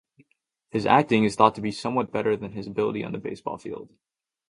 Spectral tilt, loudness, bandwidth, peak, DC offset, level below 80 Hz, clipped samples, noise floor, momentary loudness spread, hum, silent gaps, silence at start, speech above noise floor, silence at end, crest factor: -6 dB/octave; -24 LUFS; 11 kHz; -2 dBFS; under 0.1%; -60 dBFS; under 0.1%; -72 dBFS; 14 LU; none; none; 0.75 s; 47 dB; 0.65 s; 22 dB